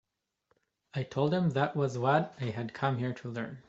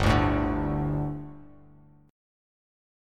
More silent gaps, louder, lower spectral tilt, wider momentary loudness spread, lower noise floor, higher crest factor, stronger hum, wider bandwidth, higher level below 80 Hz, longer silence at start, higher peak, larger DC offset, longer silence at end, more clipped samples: neither; second, -32 LUFS vs -27 LUFS; about the same, -7.5 dB/octave vs -7 dB/octave; second, 10 LU vs 15 LU; first, -77 dBFS vs -55 dBFS; about the same, 20 dB vs 22 dB; second, none vs 50 Hz at -55 dBFS; second, 7.8 kHz vs 13 kHz; second, -70 dBFS vs -38 dBFS; first, 0.95 s vs 0 s; second, -12 dBFS vs -8 dBFS; neither; second, 0.1 s vs 1 s; neither